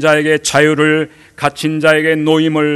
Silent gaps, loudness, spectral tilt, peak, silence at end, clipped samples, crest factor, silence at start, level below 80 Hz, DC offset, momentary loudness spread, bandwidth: none; -12 LUFS; -4.5 dB/octave; 0 dBFS; 0 s; 0.2%; 12 dB; 0 s; -54 dBFS; under 0.1%; 8 LU; 12.5 kHz